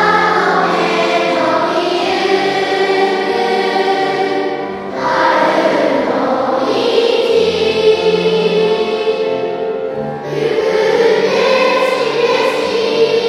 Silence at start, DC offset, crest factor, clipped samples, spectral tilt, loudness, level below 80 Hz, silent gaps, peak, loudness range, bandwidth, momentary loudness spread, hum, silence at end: 0 s; under 0.1%; 14 dB; under 0.1%; -4.5 dB/octave; -14 LUFS; -56 dBFS; none; 0 dBFS; 2 LU; 12.5 kHz; 6 LU; none; 0 s